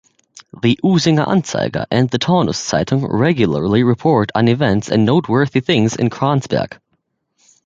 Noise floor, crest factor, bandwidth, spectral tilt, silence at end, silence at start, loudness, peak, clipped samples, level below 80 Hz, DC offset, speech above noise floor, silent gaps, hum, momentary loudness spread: -68 dBFS; 14 dB; 8.8 kHz; -6 dB/octave; 0.9 s; 0.55 s; -16 LUFS; -2 dBFS; under 0.1%; -46 dBFS; under 0.1%; 53 dB; none; none; 4 LU